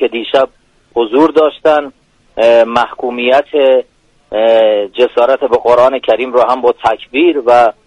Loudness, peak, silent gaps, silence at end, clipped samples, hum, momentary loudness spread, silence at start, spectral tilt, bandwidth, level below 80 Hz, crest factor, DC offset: -11 LUFS; 0 dBFS; none; 0.15 s; under 0.1%; none; 7 LU; 0 s; -5 dB/octave; 9.4 kHz; -50 dBFS; 10 dB; under 0.1%